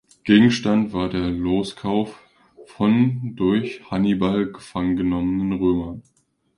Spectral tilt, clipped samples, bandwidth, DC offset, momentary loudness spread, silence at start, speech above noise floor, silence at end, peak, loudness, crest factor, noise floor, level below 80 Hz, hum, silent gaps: -7 dB/octave; under 0.1%; 11 kHz; under 0.1%; 9 LU; 0.25 s; 28 dB; 0.55 s; -2 dBFS; -21 LUFS; 18 dB; -48 dBFS; -46 dBFS; none; none